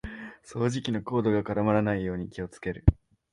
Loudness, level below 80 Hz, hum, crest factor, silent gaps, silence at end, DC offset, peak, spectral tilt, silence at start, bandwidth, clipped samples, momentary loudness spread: -28 LUFS; -38 dBFS; none; 24 dB; none; 0.4 s; under 0.1%; -4 dBFS; -7.5 dB/octave; 0.05 s; 11 kHz; under 0.1%; 14 LU